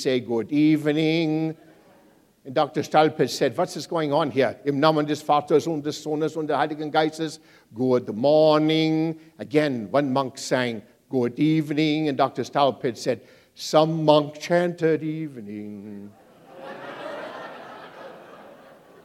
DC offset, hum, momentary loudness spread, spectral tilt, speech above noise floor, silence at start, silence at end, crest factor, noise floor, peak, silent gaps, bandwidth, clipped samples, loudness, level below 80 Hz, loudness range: under 0.1%; none; 18 LU; -6 dB/octave; 34 dB; 0 s; 0.55 s; 22 dB; -57 dBFS; -2 dBFS; none; 14.5 kHz; under 0.1%; -23 LUFS; -74 dBFS; 6 LU